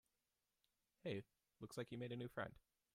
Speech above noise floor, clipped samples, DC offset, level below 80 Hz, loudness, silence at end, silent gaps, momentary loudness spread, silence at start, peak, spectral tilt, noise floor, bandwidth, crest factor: over 40 dB; under 0.1%; under 0.1%; -80 dBFS; -52 LUFS; 0.35 s; none; 5 LU; 1.05 s; -34 dBFS; -6 dB/octave; under -90 dBFS; 15 kHz; 20 dB